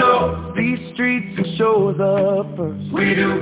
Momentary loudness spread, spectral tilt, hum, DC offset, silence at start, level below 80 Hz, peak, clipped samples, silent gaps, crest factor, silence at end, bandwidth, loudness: 7 LU; -10.5 dB/octave; none; under 0.1%; 0 s; -42 dBFS; -2 dBFS; under 0.1%; none; 16 dB; 0 s; 4 kHz; -19 LUFS